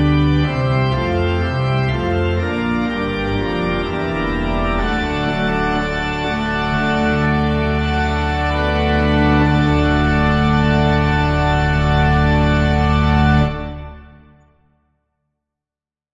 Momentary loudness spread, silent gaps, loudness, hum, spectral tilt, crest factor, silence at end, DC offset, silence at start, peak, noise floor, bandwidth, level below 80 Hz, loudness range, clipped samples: 5 LU; none; -17 LUFS; none; -7.5 dB/octave; 14 dB; 2.1 s; under 0.1%; 0 s; -2 dBFS; under -90 dBFS; 7.6 kHz; -26 dBFS; 4 LU; under 0.1%